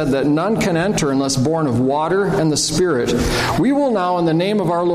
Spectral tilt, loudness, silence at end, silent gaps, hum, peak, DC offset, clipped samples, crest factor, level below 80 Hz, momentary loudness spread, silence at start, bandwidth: -5 dB/octave; -17 LUFS; 0 s; none; none; -6 dBFS; under 0.1%; under 0.1%; 10 dB; -36 dBFS; 1 LU; 0 s; 15.5 kHz